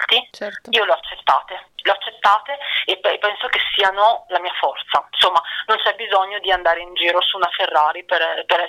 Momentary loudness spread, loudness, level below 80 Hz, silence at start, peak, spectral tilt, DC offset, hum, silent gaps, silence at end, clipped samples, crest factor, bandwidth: 6 LU; -18 LUFS; -56 dBFS; 0 s; -4 dBFS; -1 dB/octave; under 0.1%; none; none; 0 s; under 0.1%; 16 dB; 19 kHz